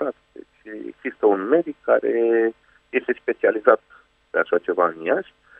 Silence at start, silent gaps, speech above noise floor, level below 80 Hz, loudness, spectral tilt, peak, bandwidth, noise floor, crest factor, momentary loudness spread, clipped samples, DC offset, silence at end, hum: 0 s; none; 25 dB; -68 dBFS; -21 LUFS; -8 dB/octave; 0 dBFS; 3.8 kHz; -46 dBFS; 22 dB; 13 LU; under 0.1%; under 0.1%; 0.4 s; none